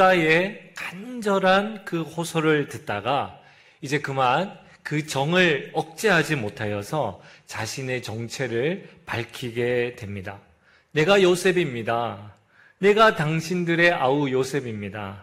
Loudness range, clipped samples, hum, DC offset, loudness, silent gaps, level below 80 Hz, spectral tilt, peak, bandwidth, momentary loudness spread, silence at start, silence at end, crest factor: 7 LU; under 0.1%; none; under 0.1%; -23 LUFS; none; -60 dBFS; -5 dB/octave; -6 dBFS; 16 kHz; 15 LU; 0 s; 0 s; 18 dB